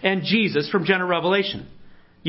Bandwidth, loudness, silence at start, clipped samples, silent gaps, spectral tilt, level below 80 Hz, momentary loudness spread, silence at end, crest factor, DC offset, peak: 5.8 kHz; -21 LUFS; 0 s; under 0.1%; none; -9.5 dB/octave; -58 dBFS; 5 LU; 0 s; 18 dB; under 0.1%; -4 dBFS